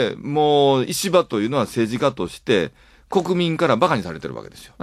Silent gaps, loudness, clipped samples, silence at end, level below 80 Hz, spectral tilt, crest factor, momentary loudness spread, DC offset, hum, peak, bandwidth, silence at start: none; -20 LUFS; under 0.1%; 0.15 s; -54 dBFS; -5 dB/octave; 18 dB; 13 LU; under 0.1%; none; -2 dBFS; 15.5 kHz; 0 s